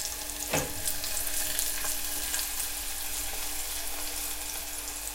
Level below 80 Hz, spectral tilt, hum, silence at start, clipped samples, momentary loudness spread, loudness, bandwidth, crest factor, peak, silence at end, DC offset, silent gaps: -46 dBFS; -0.5 dB/octave; none; 0 s; under 0.1%; 5 LU; -31 LUFS; 17 kHz; 26 dB; -6 dBFS; 0 s; under 0.1%; none